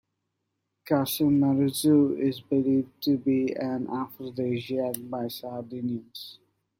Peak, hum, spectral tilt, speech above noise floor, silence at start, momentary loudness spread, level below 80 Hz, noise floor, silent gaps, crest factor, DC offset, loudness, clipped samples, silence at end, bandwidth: -8 dBFS; none; -6 dB/octave; 54 dB; 0.85 s; 13 LU; -68 dBFS; -80 dBFS; none; 20 dB; under 0.1%; -27 LUFS; under 0.1%; 0.45 s; 16.5 kHz